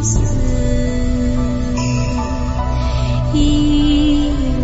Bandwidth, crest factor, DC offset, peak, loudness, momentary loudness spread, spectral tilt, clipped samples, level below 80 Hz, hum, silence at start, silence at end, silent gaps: 8 kHz; 10 dB; under 0.1%; -4 dBFS; -17 LUFS; 6 LU; -6 dB/octave; under 0.1%; -18 dBFS; none; 0 s; 0 s; none